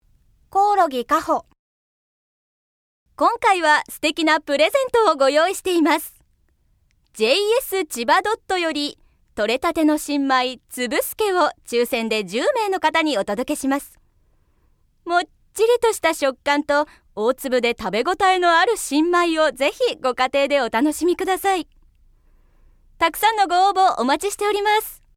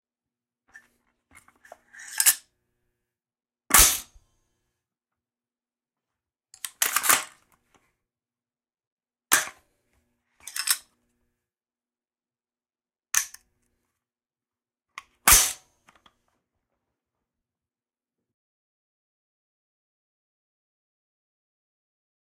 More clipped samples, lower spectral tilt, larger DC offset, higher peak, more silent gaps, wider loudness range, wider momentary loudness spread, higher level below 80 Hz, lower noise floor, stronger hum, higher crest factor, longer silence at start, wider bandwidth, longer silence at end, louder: neither; first, -2.5 dB/octave vs 0.5 dB/octave; neither; about the same, -4 dBFS vs -2 dBFS; first, 1.59-3.06 s vs 8.87-8.97 s; second, 4 LU vs 11 LU; second, 6 LU vs 22 LU; second, -54 dBFS vs -48 dBFS; second, -62 dBFS vs under -90 dBFS; neither; second, 18 dB vs 28 dB; second, 0.55 s vs 1.95 s; first, 18.5 kHz vs 16 kHz; second, 0.2 s vs 6.8 s; about the same, -19 LUFS vs -21 LUFS